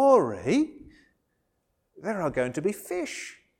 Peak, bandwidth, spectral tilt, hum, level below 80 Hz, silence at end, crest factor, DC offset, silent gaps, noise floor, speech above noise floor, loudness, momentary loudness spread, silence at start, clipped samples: -8 dBFS; 18 kHz; -5.5 dB/octave; none; -60 dBFS; 0.25 s; 20 dB; under 0.1%; none; -75 dBFS; 47 dB; -28 LUFS; 12 LU; 0 s; under 0.1%